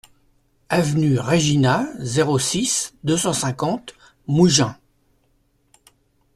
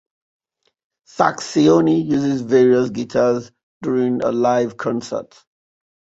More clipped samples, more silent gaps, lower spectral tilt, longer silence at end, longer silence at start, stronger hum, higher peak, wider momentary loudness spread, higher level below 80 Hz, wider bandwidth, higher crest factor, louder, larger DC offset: neither; second, none vs 3.63-3.81 s; second, -4.5 dB/octave vs -6.5 dB/octave; first, 1.6 s vs 0.9 s; second, 0.7 s vs 1.15 s; neither; about the same, -4 dBFS vs -2 dBFS; about the same, 9 LU vs 11 LU; first, -52 dBFS vs -60 dBFS; first, 14 kHz vs 8 kHz; about the same, 18 dB vs 18 dB; about the same, -19 LUFS vs -18 LUFS; neither